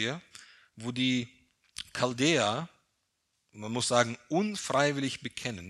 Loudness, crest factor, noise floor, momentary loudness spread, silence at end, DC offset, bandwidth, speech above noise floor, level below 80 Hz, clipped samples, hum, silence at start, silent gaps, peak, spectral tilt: -30 LUFS; 24 dB; -79 dBFS; 18 LU; 0 s; under 0.1%; 12.5 kHz; 49 dB; -70 dBFS; under 0.1%; none; 0 s; none; -8 dBFS; -4 dB/octave